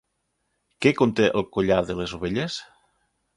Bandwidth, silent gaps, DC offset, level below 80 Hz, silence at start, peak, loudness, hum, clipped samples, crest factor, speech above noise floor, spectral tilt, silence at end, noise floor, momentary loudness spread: 11.5 kHz; none; under 0.1%; -50 dBFS; 0.8 s; -4 dBFS; -23 LUFS; none; under 0.1%; 22 dB; 53 dB; -6 dB/octave; 0.75 s; -75 dBFS; 9 LU